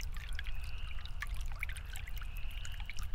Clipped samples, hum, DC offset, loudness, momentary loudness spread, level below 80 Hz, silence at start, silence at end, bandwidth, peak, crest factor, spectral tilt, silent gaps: under 0.1%; none; under 0.1%; -45 LUFS; 3 LU; -40 dBFS; 0 s; 0 s; 16 kHz; -22 dBFS; 16 dB; -3 dB/octave; none